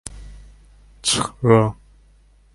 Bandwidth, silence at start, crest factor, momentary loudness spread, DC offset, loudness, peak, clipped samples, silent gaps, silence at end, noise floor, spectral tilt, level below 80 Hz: 11.5 kHz; 0.05 s; 22 dB; 9 LU; under 0.1%; -19 LUFS; 0 dBFS; under 0.1%; none; 0.85 s; -53 dBFS; -4.5 dB/octave; -44 dBFS